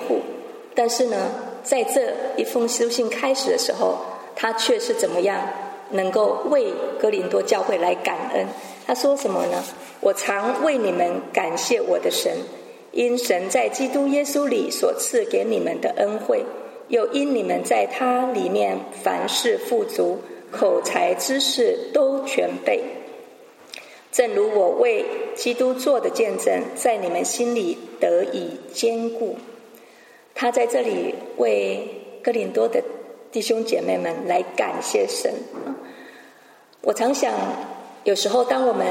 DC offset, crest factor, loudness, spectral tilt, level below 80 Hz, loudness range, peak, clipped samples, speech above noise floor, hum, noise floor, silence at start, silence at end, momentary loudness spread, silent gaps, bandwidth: under 0.1%; 18 dB; -22 LUFS; -3 dB/octave; -82 dBFS; 3 LU; -4 dBFS; under 0.1%; 30 dB; none; -51 dBFS; 0 s; 0 s; 10 LU; none; 16.5 kHz